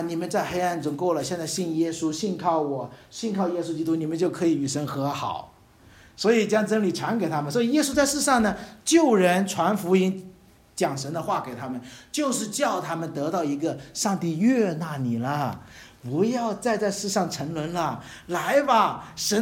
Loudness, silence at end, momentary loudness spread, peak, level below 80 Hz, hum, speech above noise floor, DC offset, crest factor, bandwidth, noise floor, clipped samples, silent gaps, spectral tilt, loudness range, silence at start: -25 LUFS; 0 s; 10 LU; -6 dBFS; -58 dBFS; none; 28 dB; under 0.1%; 18 dB; 17 kHz; -53 dBFS; under 0.1%; none; -4.5 dB/octave; 5 LU; 0 s